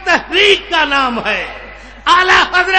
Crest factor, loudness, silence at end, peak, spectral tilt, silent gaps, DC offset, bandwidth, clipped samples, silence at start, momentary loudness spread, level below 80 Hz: 12 dB; -11 LUFS; 0 s; 0 dBFS; -2 dB/octave; none; 0.3%; 10.5 kHz; under 0.1%; 0 s; 11 LU; -38 dBFS